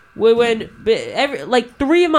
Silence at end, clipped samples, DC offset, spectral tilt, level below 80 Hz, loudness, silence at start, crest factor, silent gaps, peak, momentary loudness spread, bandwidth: 0 s; under 0.1%; under 0.1%; -4.5 dB/octave; -46 dBFS; -17 LUFS; 0.15 s; 16 dB; none; 0 dBFS; 6 LU; 11 kHz